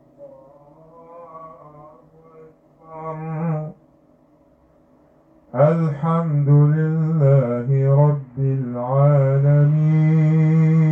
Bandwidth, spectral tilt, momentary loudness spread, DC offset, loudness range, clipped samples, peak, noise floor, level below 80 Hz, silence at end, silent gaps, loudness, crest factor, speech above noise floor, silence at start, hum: 3.3 kHz; -12 dB/octave; 15 LU; under 0.1%; 15 LU; under 0.1%; -4 dBFS; -55 dBFS; -60 dBFS; 0 s; none; -18 LUFS; 16 dB; 39 dB; 0.2 s; none